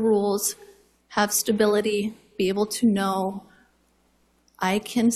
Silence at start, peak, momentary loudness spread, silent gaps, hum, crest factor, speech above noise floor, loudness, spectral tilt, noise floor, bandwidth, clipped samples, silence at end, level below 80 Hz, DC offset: 0 s; -8 dBFS; 10 LU; none; none; 16 dB; 42 dB; -24 LUFS; -4 dB/octave; -64 dBFS; 14.5 kHz; under 0.1%; 0 s; -62 dBFS; under 0.1%